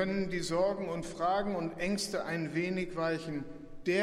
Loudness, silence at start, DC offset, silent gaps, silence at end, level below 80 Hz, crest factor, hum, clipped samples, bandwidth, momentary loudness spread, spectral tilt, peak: -34 LUFS; 0 s; under 0.1%; none; 0 s; -56 dBFS; 16 dB; none; under 0.1%; 15 kHz; 7 LU; -5 dB/octave; -16 dBFS